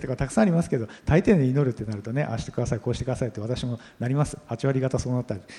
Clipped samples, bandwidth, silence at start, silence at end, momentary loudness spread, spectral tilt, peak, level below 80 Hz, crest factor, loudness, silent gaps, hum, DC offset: under 0.1%; 11.5 kHz; 0 s; 0 s; 9 LU; -7 dB/octave; -6 dBFS; -44 dBFS; 18 dB; -26 LUFS; none; none; under 0.1%